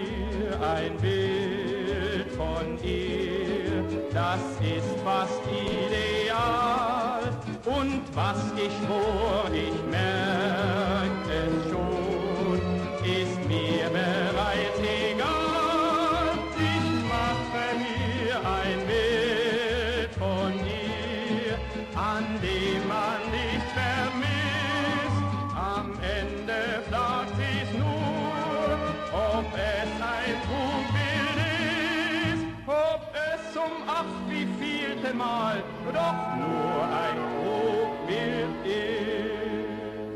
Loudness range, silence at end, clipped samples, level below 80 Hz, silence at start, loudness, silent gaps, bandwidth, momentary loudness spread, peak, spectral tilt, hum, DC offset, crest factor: 3 LU; 0 s; under 0.1%; -44 dBFS; 0 s; -28 LUFS; none; 13 kHz; 5 LU; -14 dBFS; -6 dB/octave; none; under 0.1%; 14 dB